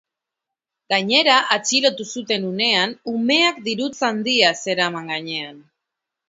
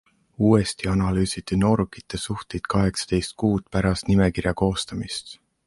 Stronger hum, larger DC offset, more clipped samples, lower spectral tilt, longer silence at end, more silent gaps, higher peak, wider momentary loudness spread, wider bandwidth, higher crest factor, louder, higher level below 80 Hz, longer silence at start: neither; neither; neither; second, -2.5 dB/octave vs -6 dB/octave; first, 0.7 s vs 0.3 s; neither; first, 0 dBFS vs -4 dBFS; about the same, 10 LU vs 10 LU; second, 8 kHz vs 11.5 kHz; about the same, 20 dB vs 18 dB; first, -18 LUFS vs -23 LUFS; second, -72 dBFS vs -38 dBFS; first, 0.9 s vs 0.4 s